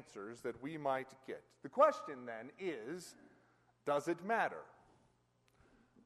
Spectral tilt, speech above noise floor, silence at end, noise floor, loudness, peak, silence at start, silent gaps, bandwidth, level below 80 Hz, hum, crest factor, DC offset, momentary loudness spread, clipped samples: -5 dB/octave; 36 dB; 1.35 s; -75 dBFS; -39 LUFS; -18 dBFS; 0 s; none; 13 kHz; -82 dBFS; none; 24 dB; under 0.1%; 18 LU; under 0.1%